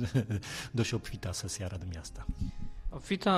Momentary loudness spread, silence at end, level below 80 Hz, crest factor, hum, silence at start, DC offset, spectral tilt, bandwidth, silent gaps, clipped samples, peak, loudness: 10 LU; 0 s; -44 dBFS; 18 dB; none; 0 s; under 0.1%; -5 dB/octave; 14.5 kHz; none; under 0.1%; -14 dBFS; -37 LUFS